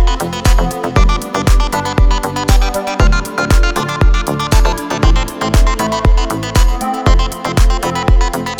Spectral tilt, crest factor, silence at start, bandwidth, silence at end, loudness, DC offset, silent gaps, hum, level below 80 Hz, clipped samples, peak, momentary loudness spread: -5 dB/octave; 12 dB; 0 s; 16 kHz; 0 s; -14 LUFS; under 0.1%; none; none; -12 dBFS; under 0.1%; 0 dBFS; 3 LU